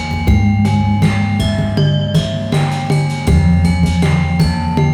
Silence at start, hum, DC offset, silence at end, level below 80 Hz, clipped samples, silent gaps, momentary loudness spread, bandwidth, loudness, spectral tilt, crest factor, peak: 0 s; none; under 0.1%; 0 s; -24 dBFS; under 0.1%; none; 3 LU; 13 kHz; -14 LUFS; -7 dB/octave; 10 dB; -2 dBFS